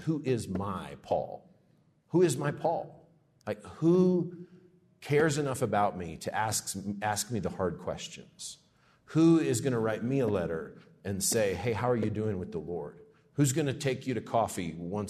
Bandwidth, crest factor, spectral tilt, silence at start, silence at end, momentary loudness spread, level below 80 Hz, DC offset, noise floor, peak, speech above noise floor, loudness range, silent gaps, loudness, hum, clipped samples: 13.5 kHz; 18 dB; -5.5 dB/octave; 0 s; 0 s; 16 LU; -66 dBFS; under 0.1%; -66 dBFS; -14 dBFS; 37 dB; 3 LU; none; -30 LUFS; none; under 0.1%